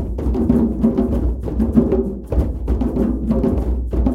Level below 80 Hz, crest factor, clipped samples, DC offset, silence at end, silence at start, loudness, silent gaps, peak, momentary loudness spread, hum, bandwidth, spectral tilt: -22 dBFS; 16 dB; under 0.1%; under 0.1%; 0 s; 0 s; -19 LUFS; none; 0 dBFS; 6 LU; none; 4.5 kHz; -10.5 dB/octave